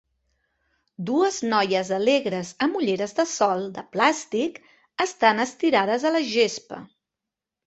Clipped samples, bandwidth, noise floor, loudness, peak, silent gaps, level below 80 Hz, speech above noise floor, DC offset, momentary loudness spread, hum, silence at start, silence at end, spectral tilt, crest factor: under 0.1%; 8.2 kHz; -87 dBFS; -23 LUFS; -4 dBFS; none; -70 dBFS; 64 dB; under 0.1%; 10 LU; none; 1 s; 0.8 s; -3.5 dB/octave; 20 dB